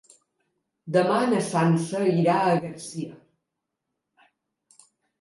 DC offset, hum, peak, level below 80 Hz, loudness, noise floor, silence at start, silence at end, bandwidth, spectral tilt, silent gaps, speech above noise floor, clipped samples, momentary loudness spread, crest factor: under 0.1%; none; -10 dBFS; -72 dBFS; -23 LUFS; -83 dBFS; 0.85 s; 2.05 s; 11.5 kHz; -6.5 dB/octave; none; 60 dB; under 0.1%; 14 LU; 16 dB